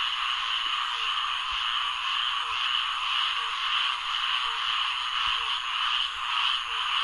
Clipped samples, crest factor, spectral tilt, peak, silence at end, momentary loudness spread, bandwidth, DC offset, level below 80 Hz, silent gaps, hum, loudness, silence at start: under 0.1%; 16 dB; 2.5 dB/octave; -12 dBFS; 0 s; 2 LU; 11.5 kHz; under 0.1%; -58 dBFS; none; none; -26 LUFS; 0 s